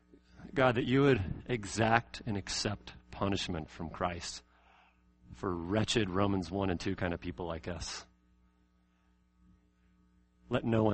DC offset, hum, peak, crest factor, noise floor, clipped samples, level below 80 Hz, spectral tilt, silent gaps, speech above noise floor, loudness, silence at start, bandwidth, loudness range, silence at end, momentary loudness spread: under 0.1%; none; -10 dBFS; 26 dB; -70 dBFS; under 0.1%; -54 dBFS; -5.5 dB/octave; none; 38 dB; -33 LUFS; 0.35 s; 8.4 kHz; 11 LU; 0 s; 13 LU